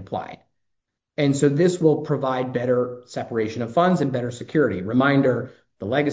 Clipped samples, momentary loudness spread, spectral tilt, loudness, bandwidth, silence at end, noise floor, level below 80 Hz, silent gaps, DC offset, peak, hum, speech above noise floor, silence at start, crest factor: under 0.1%; 13 LU; -7 dB/octave; -22 LUFS; 8 kHz; 0 s; -78 dBFS; -58 dBFS; none; under 0.1%; -4 dBFS; none; 57 dB; 0 s; 18 dB